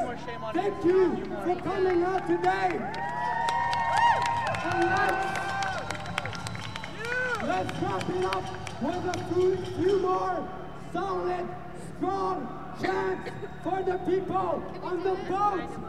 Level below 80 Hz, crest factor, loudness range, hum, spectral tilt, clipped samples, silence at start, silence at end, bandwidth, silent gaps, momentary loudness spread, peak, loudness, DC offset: -52 dBFS; 20 dB; 5 LU; none; -5.5 dB/octave; under 0.1%; 0 s; 0 s; 13 kHz; none; 11 LU; -10 dBFS; -29 LUFS; 0.7%